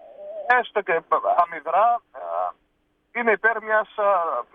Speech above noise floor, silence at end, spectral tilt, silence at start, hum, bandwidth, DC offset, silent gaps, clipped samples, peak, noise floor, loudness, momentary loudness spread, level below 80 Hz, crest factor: 47 dB; 0.1 s; -5.5 dB/octave; 0.05 s; none; 5.2 kHz; under 0.1%; none; under 0.1%; -6 dBFS; -69 dBFS; -22 LUFS; 11 LU; -70 dBFS; 16 dB